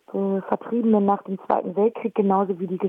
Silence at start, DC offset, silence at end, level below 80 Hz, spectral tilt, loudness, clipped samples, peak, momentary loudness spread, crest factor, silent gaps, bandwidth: 0.1 s; under 0.1%; 0 s; -70 dBFS; -11 dB/octave; -23 LUFS; under 0.1%; -6 dBFS; 6 LU; 16 dB; none; 3.7 kHz